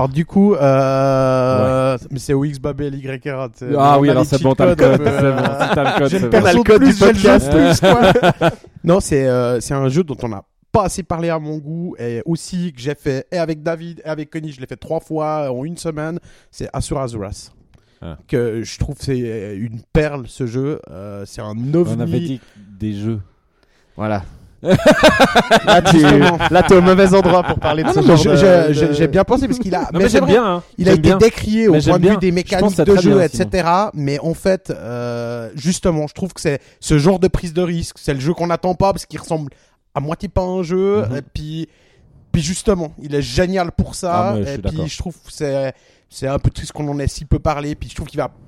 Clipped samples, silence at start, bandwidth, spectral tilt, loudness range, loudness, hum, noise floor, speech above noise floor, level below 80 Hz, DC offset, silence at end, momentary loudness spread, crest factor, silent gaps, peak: under 0.1%; 0 s; 15.5 kHz; -6 dB/octave; 12 LU; -15 LUFS; none; -56 dBFS; 41 dB; -34 dBFS; under 0.1%; 0.2 s; 16 LU; 14 dB; none; 0 dBFS